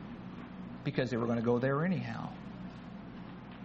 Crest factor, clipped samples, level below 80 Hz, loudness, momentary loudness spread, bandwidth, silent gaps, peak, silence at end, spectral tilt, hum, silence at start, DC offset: 20 dB; under 0.1%; -60 dBFS; -35 LUFS; 16 LU; 7.6 kHz; none; -16 dBFS; 0 s; -6.5 dB/octave; none; 0 s; under 0.1%